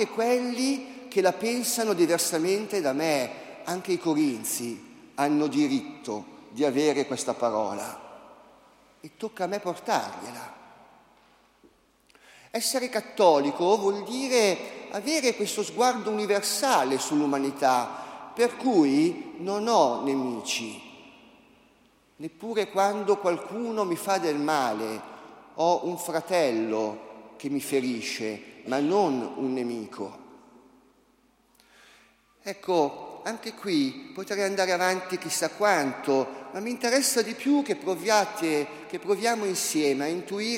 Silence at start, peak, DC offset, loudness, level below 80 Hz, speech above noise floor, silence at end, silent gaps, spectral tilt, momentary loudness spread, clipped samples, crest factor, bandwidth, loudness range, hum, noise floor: 0 s; -6 dBFS; under 0.1%; -26 LUFS; -76 dBFS; 38 dB; 0 s; none; -3.5 dB/octave; 14 LU; under 0.1%; 20 dB; 16 kHz; 9 LU; none; -64 dBFS